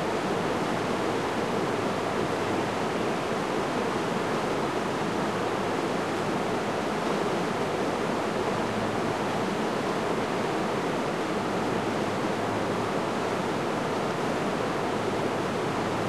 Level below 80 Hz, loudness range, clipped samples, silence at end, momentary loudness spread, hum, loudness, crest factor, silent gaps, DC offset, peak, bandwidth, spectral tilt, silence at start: -56 dBFS; 0 LU; under 0.1%; 0 s; 1 LU; none; -28 LUFS; 14 dB; none; 0.2%; -14 dBFS; 13 kHz; -5 dB/octave; 0 s